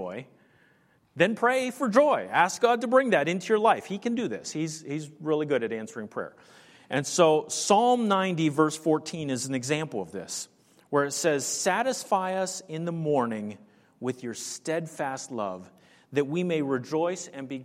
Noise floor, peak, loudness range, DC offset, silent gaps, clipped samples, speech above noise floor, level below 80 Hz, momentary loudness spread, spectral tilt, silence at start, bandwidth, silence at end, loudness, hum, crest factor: -64 dBFS; -6 dBFS; 7 LU; under 0.1%; none; under 0.1%; 37 dB; -76 dBFS; 13 LU; -4 dB/octave; 0 s; 16 kHz; 0 s; -27 LUFS; none; 20 dB